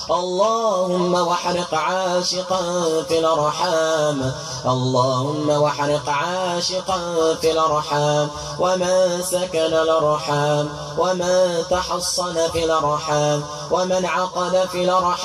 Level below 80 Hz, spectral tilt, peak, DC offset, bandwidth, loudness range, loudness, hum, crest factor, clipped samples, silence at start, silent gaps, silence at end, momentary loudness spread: -50 dBFS; -4 dB/octave; -6 dBFS; under 0.1%; 15 kHz; 1 LU; -20 LUFS; none; 14 dB; under 0.1%; 0 s; none; 0 s; 4 LU